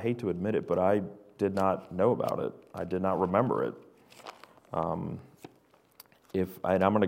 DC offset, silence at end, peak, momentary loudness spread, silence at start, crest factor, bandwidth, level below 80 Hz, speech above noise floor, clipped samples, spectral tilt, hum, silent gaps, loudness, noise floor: under 0.1%; 0 s; -10 dBFS; 17 LU; 0 s; 22 dB; 16 kHz; -66 dBFS; 34 dB; under 0.1%; -8 dB/octave; none; none; -30 LUFS; -63 dBFS